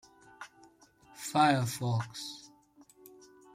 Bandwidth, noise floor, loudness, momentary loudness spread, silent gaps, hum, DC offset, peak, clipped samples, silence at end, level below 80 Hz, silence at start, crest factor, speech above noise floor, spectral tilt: 16 kHz; -61 dBFS; -31 LUFS; 24 LU; none; none; under 0.1%; -12 dBFS; under 0.1%; 1.1 s; -72 dBFS; 0.4 s; 22 dB; 32 dB; -5 dB/octave